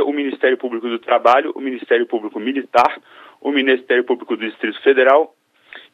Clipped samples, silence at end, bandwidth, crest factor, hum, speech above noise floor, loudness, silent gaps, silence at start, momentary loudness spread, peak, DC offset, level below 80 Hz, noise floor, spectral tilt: under 0.1%; 0.15 s; 8 kHz; 16 dB; none; 26 dB; -17 LUFS; none; 0 s; 11 LU; 0 dBFS; under 0.1%; -70 dBFS; -43 dBFS; -4.5 dB/octave